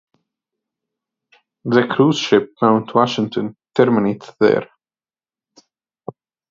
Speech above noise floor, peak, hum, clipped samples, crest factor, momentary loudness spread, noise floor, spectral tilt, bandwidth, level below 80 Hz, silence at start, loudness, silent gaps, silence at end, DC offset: over 74 dB; 0 dBFS; none; under 0.1%; 20 dB; 19 LU; under -90 dBFS; -6 dB/octave; 7.6 kHz; -64 dBFS; 1.65 s; -17 LUFS; none; 1.85 s; under 0.1%